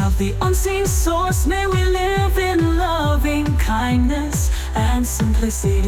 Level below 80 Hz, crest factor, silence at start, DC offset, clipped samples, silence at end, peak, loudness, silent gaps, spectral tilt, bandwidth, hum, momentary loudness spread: -22 dBFS; 10 dB; 0 s; under 0.1%; under 0.1%; 0 s; -8 dBFS; -19 LUFS; none; -5.5 dB/octave; 18 kHz; none; 2 LU